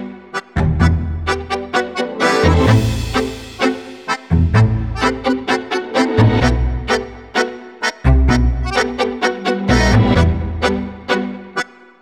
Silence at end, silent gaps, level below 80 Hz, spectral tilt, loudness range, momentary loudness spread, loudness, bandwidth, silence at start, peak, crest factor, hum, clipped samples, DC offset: 0.35 s; none; -24 dBFS; -6 dB/octave; 2 LU; 11 LU; -17 LUFS; 13.5 kHz; 0 s; 0 dBFS; 16 dB; none; under 0.1%; under 0.1%